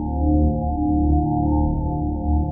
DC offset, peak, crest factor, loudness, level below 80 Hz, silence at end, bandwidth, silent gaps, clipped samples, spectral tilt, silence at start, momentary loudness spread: under 0.1%; -8 dBFS; 12 dB; -21 LUFS; -24 dBFS; 0 s; 1 kHz; none; under 0.1%; -17 dB/octave; 0 s; 4 LU